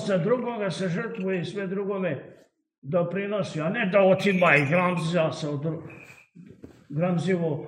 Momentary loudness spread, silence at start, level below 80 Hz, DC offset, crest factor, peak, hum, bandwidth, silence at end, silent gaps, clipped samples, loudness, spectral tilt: 12 LU; 0 s; -70 dBFS; under 0.1%; 22 dB; -4 dBFS; none; 10 kHz; 0 s; 2.78-2.82 s; under 0.1%; -25 LUFS; -6.5 dB/octave